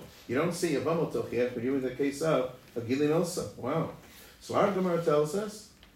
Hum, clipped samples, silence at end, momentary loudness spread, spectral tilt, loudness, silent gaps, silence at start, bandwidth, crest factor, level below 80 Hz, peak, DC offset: none; under 0.1%; 0.3 s; 11 LU; -6 dB/octave; -30 LUFS; none; 0 s; 16 kHz; 18 dB; -62 dBFS; -12 dBFS; under 0.1%